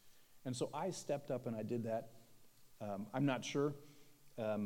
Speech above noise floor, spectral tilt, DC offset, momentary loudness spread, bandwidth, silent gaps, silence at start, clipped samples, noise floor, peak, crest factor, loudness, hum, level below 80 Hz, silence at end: 22 dB; -5.5 dB/octave; under 0.1%; 13 LU; 17 kHz; none; 0.05 s; under 0.1%; -62 dBFS; -24 dBFS; 20 dB; -42 LUFS; none; -80 dBFS; 0 s